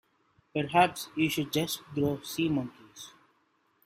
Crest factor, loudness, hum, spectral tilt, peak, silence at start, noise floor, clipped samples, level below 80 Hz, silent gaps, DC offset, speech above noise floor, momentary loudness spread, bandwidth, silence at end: 22 dB; -30 LUFS; none; -5 dB/octave; -10 dBFS; 0.55 s; -71 dBFS; under 0.1%; -64 dBFS; none; under 0.1%; 42 dB; 22 LU; 16 kHz; 0.75 s